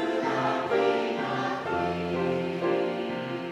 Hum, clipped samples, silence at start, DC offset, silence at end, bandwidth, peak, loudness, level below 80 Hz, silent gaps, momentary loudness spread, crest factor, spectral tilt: none; under 0.1%; 0 s; under 0.1%; 0 s; 12 kHz; -14 dBFS; -28 LUFS; -62 dBFS; none; 5 LU; 14 dB; -6.5 dB/octave